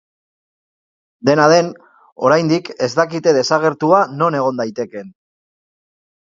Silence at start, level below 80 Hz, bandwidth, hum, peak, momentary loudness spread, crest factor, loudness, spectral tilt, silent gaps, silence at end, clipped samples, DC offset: 1.25 s; -64 dBFS; 7.6 kHz; none; 0 dBFS; 11 LU; 18 dB; -15 LUFS; -5 dB/octave; 2.12-2.16 s; 1.25 s; under 0.1%; under 0.1%